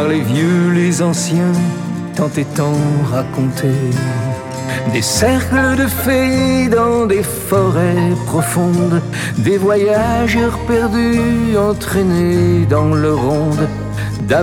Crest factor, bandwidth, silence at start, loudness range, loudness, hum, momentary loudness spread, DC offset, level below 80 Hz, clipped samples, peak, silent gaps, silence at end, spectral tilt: 14 dB; 17 kHz; 0 s; 3 LU; -15 LUFS; none; 6 LU; under 0.1%; -34 dBFS; under 0.1%; 0 dBFS; none; 0 s; -6 dB/octave